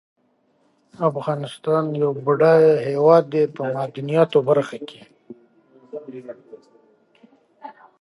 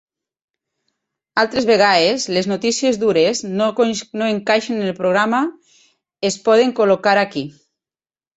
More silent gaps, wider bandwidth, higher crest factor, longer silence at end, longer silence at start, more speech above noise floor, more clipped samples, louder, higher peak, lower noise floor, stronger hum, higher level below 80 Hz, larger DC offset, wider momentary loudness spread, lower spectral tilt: neither; first, 11 kHz vs 8.2 kHz; about the same, 20 dB vs 16 dB; second, 0.3 s vs 0.85 s; second, 1 s vs 1.35 s; second, 45 dB vs over 74 dB; neither; about the same, -19 LUFS vs -17 LUFS; about the same, -2 dBFS vs -2 dBFS; second, -64 dBFS vs under -90 dBFS; neither; second, -74 dBFS vs -60 dBFS; neither; first, 23 LU vs 9 LU; first, -8 dB/octave vs -4 dB/octave